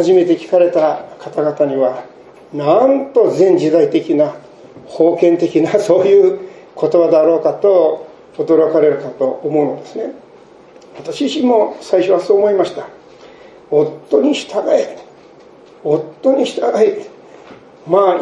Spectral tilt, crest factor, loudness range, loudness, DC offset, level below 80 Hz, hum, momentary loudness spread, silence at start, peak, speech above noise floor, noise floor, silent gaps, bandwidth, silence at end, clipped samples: -6.5 dB/octave; 14 dB; 5 LU; -14 LUFS; under 0.1%; -64 dBFS; none; 14 LU; 0 s; 0 dBFS; 29 dB; -42 dBFS; none; 11 kHz; 0 s; under 0.1%